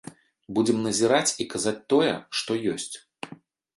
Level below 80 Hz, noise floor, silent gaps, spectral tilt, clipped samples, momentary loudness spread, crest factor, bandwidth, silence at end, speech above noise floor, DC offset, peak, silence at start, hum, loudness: -66 dBFS; -49 dBFS; none; -3.5 dB/octave; under 0.1%; 17 LU; 20 dB; 12 kHz; 0.4 s; 25 dB; under 0.1%; -8 dBFS; 0.05 s; none; -25 LUFS